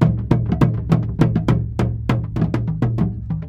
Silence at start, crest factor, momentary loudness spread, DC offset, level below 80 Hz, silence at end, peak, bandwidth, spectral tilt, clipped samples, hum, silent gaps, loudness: 0 s; 18 dB; 5 LU; under 0.1%; -30 dBFS; 0 s; -2 dBFS; 7.6 kHz; -9 dB/octave; under 0.1%; none; none; -20 LUFS